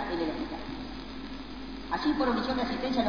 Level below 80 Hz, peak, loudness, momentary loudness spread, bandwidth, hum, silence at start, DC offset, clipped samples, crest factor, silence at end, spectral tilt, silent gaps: -48 dBFS; -14 dBFS; -32 LUFS; 13 LU; 5.4 kHz; none; 0 s; 0.4%; under 0.1%; 16 dB; 0 s; -6 dB/octave; none